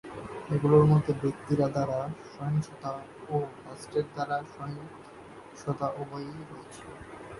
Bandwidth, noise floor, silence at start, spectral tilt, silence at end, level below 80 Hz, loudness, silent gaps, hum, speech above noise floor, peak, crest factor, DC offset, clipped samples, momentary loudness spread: 11.5 kHz; -48 dBFS; 0.05 s; -8.5 dB/octave; 0 s; -58 dBFS; -29 LUFS; none; none; 19 dB; -8 dBFS; 22 dB; under 0.1%; under 0.1%; 22 LU